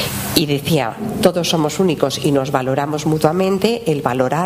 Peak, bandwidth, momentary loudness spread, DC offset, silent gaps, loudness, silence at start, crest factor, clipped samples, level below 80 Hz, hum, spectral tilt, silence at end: 0 dBFS; 16 kHz; 3 LU; under 0.1%; none; -17 LUFS; 0 s; 16 dB; under 0.1%; -46 dBFS; none; -5 dB/octave; 0 s